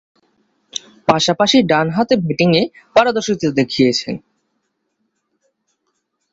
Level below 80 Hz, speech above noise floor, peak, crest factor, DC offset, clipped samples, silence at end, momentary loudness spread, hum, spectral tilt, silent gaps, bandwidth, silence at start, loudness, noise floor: -54 dBFS; 55 dB; 0 dBFS; 18 dB; under 0.1%; under 0.1%; 2.15 s; 15 LU; none; -5 dB/octave; none; 8 kHz; 0.75 s; -15 LUFS; -70 dBFS